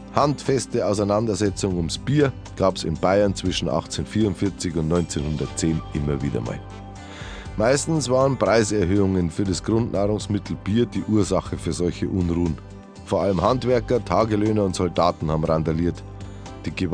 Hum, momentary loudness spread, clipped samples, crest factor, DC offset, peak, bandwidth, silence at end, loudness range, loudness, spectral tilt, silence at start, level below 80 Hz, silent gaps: none; 12 LU; under 0.1%; 20 dB; under 0.1%; -2 dBFS; 10.5 kHz; 0 s; 3 LU; -22 LUFS; -6 dB/octave; 0 s; -40 dBFS; none